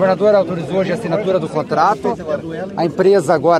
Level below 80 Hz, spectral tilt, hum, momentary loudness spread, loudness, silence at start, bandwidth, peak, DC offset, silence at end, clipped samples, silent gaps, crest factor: -52 dBFS; -6.5 dB/octave; none; 9 LU; -16 LUFS; 0 s; 12.5 kHz; 0 dBFS; under 0.1%; 0 s; under 0.1%; none; 16 dB